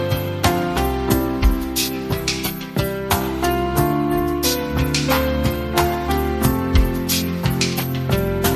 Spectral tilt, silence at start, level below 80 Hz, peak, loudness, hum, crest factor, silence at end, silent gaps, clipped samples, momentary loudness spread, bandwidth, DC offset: -5 dB/octave; 0 s; -26 dBFS; -2 dBFS; -20 LUFS; none; 18 dB; 0 s; none; under 0.1%; 3 LU; 14.5 kHz; under 0.1%